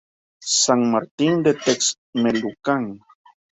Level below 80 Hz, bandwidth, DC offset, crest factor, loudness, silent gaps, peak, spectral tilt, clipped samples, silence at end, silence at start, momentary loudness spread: -62 dBFS; 8.4 kHz; under 0.1%; 18 dB; -20 LUFS; 1.11-1.18 s, 1.98-2.13 s; -4 dBFS; -3.5 dB/octave; under 0.1%; 0.6 s; 0.4 s; 7 LU